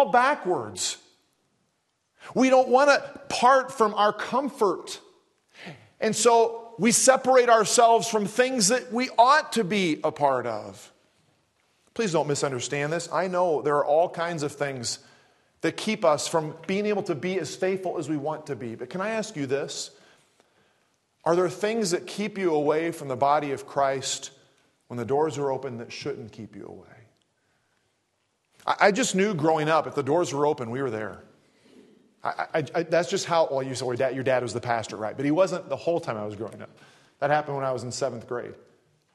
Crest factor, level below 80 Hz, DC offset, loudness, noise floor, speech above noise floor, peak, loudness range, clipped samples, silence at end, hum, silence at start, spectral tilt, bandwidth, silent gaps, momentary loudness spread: 22 dB; -72 dBFS; under 0.1%; -25 LUFS; -74 dBFS; 49 dB; -4 dBFS; 9 LU; under 0.1%; 0.6 s; none; 0 s; -3.5 dB/octave; 12.5 kHz; none; 15 LU